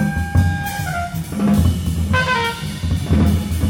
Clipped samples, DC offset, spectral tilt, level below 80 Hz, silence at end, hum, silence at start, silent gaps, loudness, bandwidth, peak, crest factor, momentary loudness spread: under 0.1%; under 0.1%; -6 dB/octave; -26 dBFS; 0 s; none; 0 s; none; -19 LUFS; 17.5 kHz; -2 dBFS; 14 dB; 7 LU